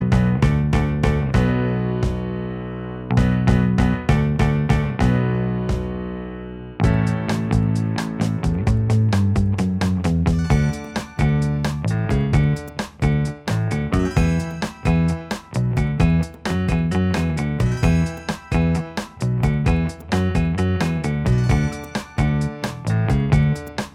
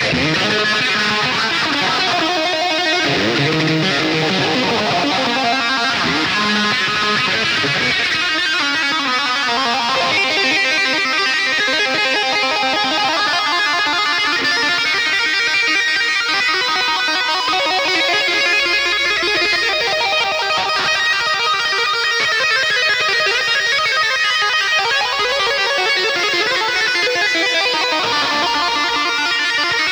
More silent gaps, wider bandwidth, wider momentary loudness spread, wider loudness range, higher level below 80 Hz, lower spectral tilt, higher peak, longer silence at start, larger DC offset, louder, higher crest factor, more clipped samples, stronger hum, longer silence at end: neither; second, 13.5 kHz vs over 20 kHz; first, 8 LU vs 2 LU; about the same, 2 LU vs 1 LU; first, -28 dBFS vs -52 dBFS; first, -7.5 dB/octave vs -2.5 dB/octave; about the same, -2 dBFS vs -4 dBFS; about the same, 0 s vs 0 s; neither; second, -21 LUFS vs -14 LUFS; first, 18 dB vs 12 dB; neither; neither; about the same, 0.05 s vs 0 s